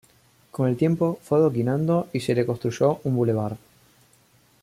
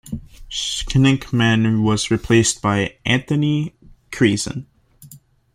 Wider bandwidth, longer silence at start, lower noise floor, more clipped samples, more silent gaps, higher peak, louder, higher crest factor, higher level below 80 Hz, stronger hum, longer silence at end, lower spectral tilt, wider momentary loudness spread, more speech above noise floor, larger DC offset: about the same, 15.5 kHz vs 15.5 kHz; first, 0.55 s vs 0.05 s; first, -59 dBFS vs -46 dBFS; neither; neither; second, -8 dBFS vs -2 dBFS; second, -23 LUFS vs -18 LUFS; about the same, 16 dB vs 18 dB; second, -62 dBFS vs -40 dBFS; neither; first, 1.05 s vs 0.35 s; first, -8 dB/octave vs -5 dB/octave; second, 6 LU vs 14 LU; first, 37 dB vs 29 dB; neither